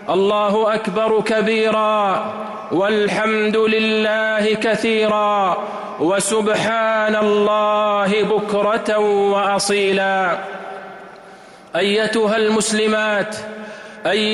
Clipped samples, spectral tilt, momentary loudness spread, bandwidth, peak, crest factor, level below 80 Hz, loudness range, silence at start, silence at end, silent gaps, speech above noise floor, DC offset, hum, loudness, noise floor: under 0.1%; -4 dB/octave; 10 LU; 12 kHz; -8 dBFS; 10 dB; -60 dBFS; 3 LU; 0 s; 0 s; none; 24 dB; under 0.1%; none; -17 LUFS; -41 dBFS